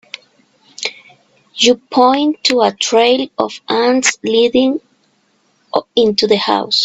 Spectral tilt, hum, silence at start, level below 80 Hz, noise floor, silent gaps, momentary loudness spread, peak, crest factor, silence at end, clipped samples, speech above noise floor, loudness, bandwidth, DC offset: -2.5 dB/octave; none; 0.8 s; -56 dBFS; -58 dBFS; none; 12 LU; 0 dBFS; 16 dB; 0 s; under 0.1%; 45 dB; -14 LUFS; 8.4 kHz; under 0.1%